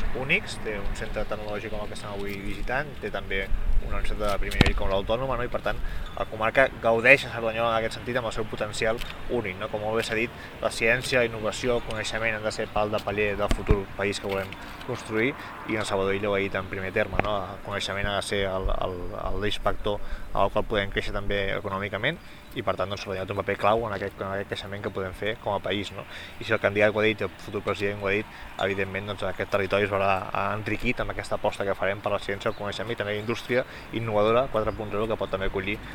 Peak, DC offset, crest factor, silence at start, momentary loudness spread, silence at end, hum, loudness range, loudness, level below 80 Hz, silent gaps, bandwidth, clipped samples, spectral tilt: 0 dBFS; under 0.1%; 26 dB; 0 s; 10 LU; 0 s; none; 5 LU; -27 LUFS; -36 dBFS; none; 16.5 kHz; under 0.1%; -5 dB/octave